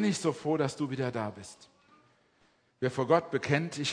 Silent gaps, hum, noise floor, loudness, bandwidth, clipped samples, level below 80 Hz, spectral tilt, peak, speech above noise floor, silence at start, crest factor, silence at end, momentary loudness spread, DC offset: none; none; -68 dBFS; -31 LUFS; 10.5 kHz; under 0.1%; -72 dBFS; -5.5 dB/octave; -10 dBFS; 38 dB; 0 s; 22 dB; 0 s; 11 LU; under 0.1%